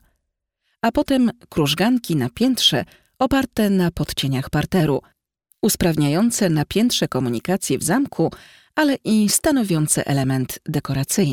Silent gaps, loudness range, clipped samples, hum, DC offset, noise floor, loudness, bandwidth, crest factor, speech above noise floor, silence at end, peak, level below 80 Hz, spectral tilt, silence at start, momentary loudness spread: none; 1 LU; under 0.1%; none; under 0.1%; -76 dBFS; -20 LUFS; 19 kHz; 14 dB; 57 dB; 0 s; -4 dBFS; -44 dBFS; -4.5 dB/octave; 0.85 s; 7 LU